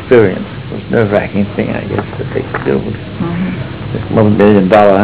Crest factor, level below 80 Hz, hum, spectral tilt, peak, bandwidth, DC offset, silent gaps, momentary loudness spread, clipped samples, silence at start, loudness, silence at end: 12 dB; -34 dBFS; none; -11.5 dB/octave; 0 dBFS; 4 kHz; 0.7%; none; 14 LU; under 0.1%; 0 s; -13 LUFS; 0 s